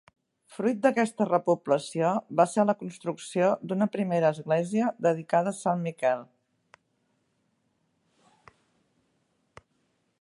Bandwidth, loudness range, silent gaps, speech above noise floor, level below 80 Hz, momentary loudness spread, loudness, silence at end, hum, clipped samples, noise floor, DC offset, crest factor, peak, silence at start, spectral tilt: 11.5 kHz; 8 LU; none; 47 dB; -78 dBFS; 6 LU; -27 LUFS; 3.95 s; none; under 0.1%; -73 dBFS; under 0.1%; 22 dB; -8 dBFS; 0.5 s; -6.5 dB/octave